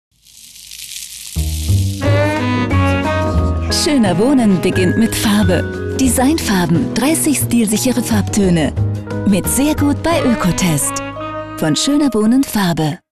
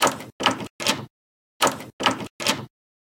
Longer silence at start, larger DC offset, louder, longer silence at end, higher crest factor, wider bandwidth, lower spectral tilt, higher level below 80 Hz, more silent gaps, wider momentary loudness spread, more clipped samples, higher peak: first, 0.35 s vs 0 s; neither; first, -15 LUFS vs -24 LUFS; second, 0.15 s vs 0.5 s; second, 10 dB vs 26 dB; second, 13.5 kHz vs 17 kHz; first, -5 dB/octave vs -2 dB/octave; first, -32 dBFS vs -62 dBFS; second, none vs 0.32-0.39 s, 0.70-0.79 s, 1.10-1.60 s, 1.93-1.99 s, 2.30-2.39 s; about the same, 9 LU vs 7 LU; neither; about the same, -4 dBFS vs -2 dBFS